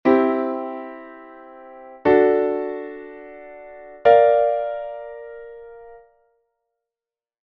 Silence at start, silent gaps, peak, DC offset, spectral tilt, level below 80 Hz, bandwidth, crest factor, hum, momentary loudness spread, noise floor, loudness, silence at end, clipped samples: 0.05 s; none; -2 dBFS; under 0.1%; -8 dB/octave; -60 dBFS; 5.6 kHz; 20 dB; none; 26 LU; under -90 dBFS; -19 LUFS; 1.65 s; under 0.1%